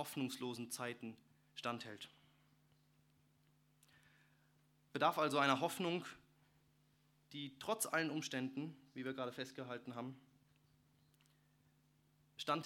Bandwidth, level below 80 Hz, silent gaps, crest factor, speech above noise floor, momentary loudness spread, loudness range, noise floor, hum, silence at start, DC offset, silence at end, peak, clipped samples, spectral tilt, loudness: 18 kHz; -86 dBFS; none; 28 dB; 33 dB; 19 LU; 13 LU; -75 dBFS; none; 0 s; under 0.1%; 0 s; -18 dBFS; under 0.1%; -4 dB/octave; -42 LUFS